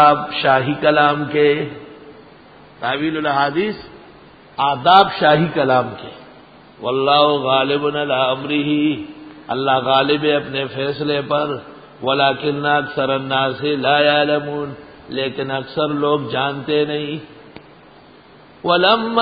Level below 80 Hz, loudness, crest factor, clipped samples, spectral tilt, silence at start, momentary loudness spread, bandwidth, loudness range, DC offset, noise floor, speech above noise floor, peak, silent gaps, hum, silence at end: -56 dBFS; -17 LUFS; 18 dB; under 0.1%; -8.5 dB/octave; 0 s; 14 LU; 5 kHz; 5 LU; under 0.1%; -45 dBFS; 28 dB; 0 dBFS; none; none; 0 s